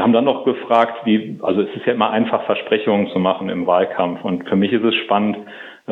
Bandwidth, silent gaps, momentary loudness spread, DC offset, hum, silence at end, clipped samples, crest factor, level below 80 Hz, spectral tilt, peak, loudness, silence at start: 4.3 kHz; none; 5 LU; under 0.1%; none; 0 s; under 0.1%; 16 dB; -68 dBFS; -8.5 dB/octave; 0 dBFS; -18 LUFS; 0 s